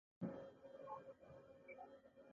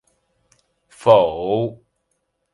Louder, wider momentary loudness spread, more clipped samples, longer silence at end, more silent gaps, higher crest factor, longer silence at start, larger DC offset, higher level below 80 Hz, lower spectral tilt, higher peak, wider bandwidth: second, -57 LUFS vs -18 LUFS; first, 12 LU vs 9 LU; neither; second, 0 s vs 0.8 s; neither; about the same, 22 dB vs 20 dB; second, 0.2 s vs 1 s; neither; second, -84 dBFS vs -56 dBFS; about the same, -7.5 dB/octave vs -7 dB/octave; second, -34 dBFS vs 0 dBFS; second, 7.2 kHz vs 11.5 kHz